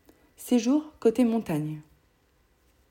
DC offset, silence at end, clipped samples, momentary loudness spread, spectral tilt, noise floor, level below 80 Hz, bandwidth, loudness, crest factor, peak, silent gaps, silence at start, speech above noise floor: under 0.1%; 1.1 s; under 0.1%; 15 LU; -6.5 dB/octave; -66 dBFS; -62 dBFS; 17 kHz; -26 LUFS; 18 dB; -12 dBFS; none; 0.4 s; 41 dB